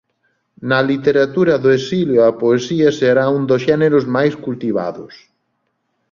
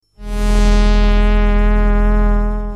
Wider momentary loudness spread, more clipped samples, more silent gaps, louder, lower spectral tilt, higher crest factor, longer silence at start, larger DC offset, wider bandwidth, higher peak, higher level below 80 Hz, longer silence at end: first, 8 LU vs 5 LU; neither; neither; about the same, -15 LUFS vs -16 LUFS; about the same, -6.5 dB/octave vs -6.5 dB/octave; about the same, 14 dB vs 10 dB; first, 0.6 s vs 0.2 s; neither; second, 7.4 kHz vs 9.4 kHz; about the same, -2 dBFS vs -2 dBFS; second, -56 dBFS vs -12 dBFS; first, 0.95 s vs 0 s